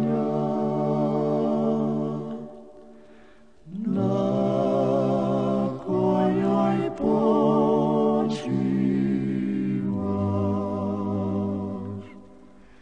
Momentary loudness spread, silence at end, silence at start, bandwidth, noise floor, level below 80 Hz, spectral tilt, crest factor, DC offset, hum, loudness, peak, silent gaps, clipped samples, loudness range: 9 LU; 0.55 s; 0 s; 8.8 kHz; -54 dBFS; -60 dBFS; -9 dB/octave; 16 dB; 0.2%; none; -24 LUFS; -10 dBFS; none; under 0.1%; 5 LU